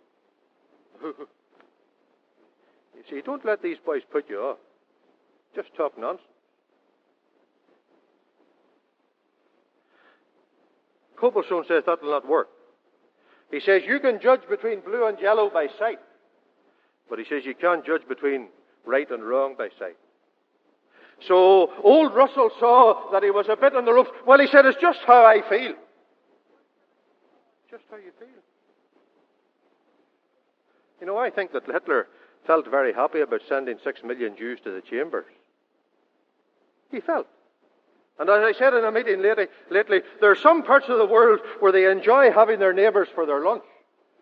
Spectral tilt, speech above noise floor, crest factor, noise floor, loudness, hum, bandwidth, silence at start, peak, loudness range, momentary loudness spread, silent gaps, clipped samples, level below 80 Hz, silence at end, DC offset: -6.5 dB/octave; 50 dB; 22 dB; -70 dBFS; -20 LUFS; none; 5.4 kHz; 1.05 s; 0 dBFS; 17 LU; 18 LU; none; under 0.1%; under -90 dBFS; 0.6 s; under 0.1%